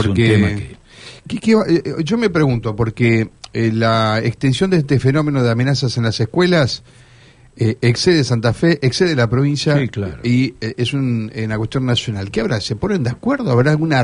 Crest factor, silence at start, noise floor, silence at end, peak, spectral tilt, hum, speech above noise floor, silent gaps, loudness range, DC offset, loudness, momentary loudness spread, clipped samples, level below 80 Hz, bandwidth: 14 dB; 0 s; -46 dBFS; 0 s; -2 dBFS; -6.5 dB/octave; none; 30 dB; none; 3 LU; under 0.1%; -17 LUFS; 7 LU; under 0.1%; -42 dBFS; 10.5 kHz